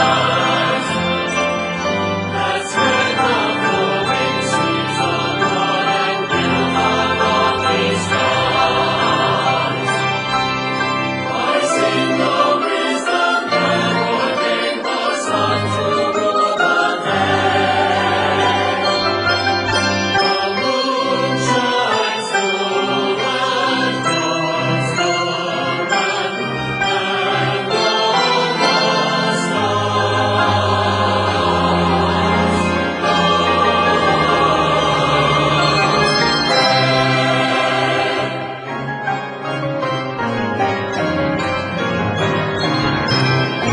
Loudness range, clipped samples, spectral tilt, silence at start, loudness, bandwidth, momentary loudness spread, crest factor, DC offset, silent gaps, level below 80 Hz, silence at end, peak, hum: 4 LU; under 0.1%; -4.5 dB/octave; 0 s; -16 LUFS; 11.5 kHz; 5 LU; 14 dB; under 0.1%; none; -46 dBFS; 0 s; -2 dBFS; none